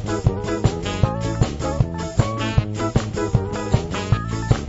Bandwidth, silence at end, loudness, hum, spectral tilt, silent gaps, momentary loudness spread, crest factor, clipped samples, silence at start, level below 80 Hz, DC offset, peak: 8 kHz; 0 s; -22 LUFS; none; -6.5 dB/octave; none; 1 LU; 18 dB; under 0.1%; 0 s; -30 dBFS; under 0.1%; -2 dBFS